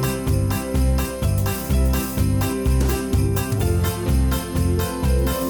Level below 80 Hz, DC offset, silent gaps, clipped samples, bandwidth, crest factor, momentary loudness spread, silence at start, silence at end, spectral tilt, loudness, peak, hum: -24 dBFS; under 0.1%; none; under 0.1%; over 20 kHz; 10 dB; 2 LU; 0 s; 0 s; -6 dB/octave; -21 LUFS; -10 dBFS; none